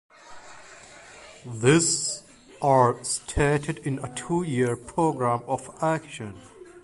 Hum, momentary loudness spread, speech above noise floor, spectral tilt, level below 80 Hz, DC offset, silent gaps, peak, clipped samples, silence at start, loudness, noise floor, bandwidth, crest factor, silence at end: none; 25 LU; 23 dB; -4.5 dB/octave; -48 dBFS; under 0.1%; none; -6 dBFS; under 0.1%; 0.25 s; -25 LUFS; -47 dBFS; 11.5 kHz; 20 dB; 0.05 s